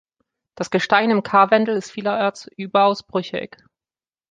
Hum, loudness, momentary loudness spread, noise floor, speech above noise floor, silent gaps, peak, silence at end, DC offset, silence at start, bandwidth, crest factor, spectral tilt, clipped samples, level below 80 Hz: none; -19 LUFS; 14 LU; under -90 dBFS; over 71 dB; none; -2 dBFS; 0.85 s; under 0.1%; 0.55 s; 9.4 kHz; 18 dB; -5 dB/octave; under 0.1%; -66 dBFS